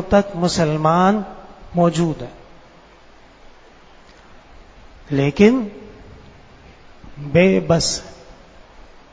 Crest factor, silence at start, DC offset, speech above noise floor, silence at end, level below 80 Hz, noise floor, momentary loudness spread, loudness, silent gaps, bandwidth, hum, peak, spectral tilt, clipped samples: 20 dB; 0 s; under 0.1%; 30 dB; 0.8 s; -44 dBFS; -46 dBFS; 20 LU; -17 LUFS; none; 8 kHz; none; 0 dBFS; -5.5 dB/octave; under 0.1%